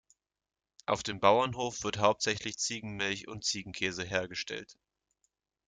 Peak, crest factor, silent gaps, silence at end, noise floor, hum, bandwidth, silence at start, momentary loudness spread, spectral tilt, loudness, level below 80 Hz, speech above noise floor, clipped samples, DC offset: -10 dBFS; 24 dB; none; 0.95 s; -80 dBFS; none; 9.6 kHz; 0.9 s; 11 LU; -3 dB/octave; -32 LUFS; -66 dBFS; 48 dB; under 0.1%; under 0.1%